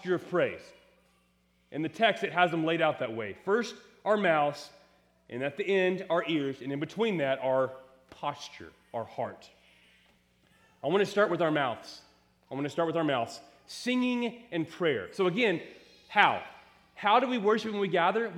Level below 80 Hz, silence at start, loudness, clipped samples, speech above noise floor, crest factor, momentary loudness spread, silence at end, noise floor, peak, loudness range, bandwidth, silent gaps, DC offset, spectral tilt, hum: -76 dBFS; 0 s; -29 LUFS; under 0.1%; 40 dB; 24 dB; 16 LU; 0 s; -69 dBFS; -6 dBFS; 5 LU; 14 kHz; none; under 0.1%; -5.5 dB/octave; none